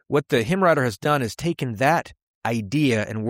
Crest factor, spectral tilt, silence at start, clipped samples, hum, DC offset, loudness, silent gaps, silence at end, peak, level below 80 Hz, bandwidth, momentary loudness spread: 16 dB; -6 dB/octave; 0.1 s; under 0.1%; none; under 0.1%; -22 LUFS; 2.23-2.41 s; 0 s; -6 dBFS; -54 dBFS; 16.5 kHz; 7 LU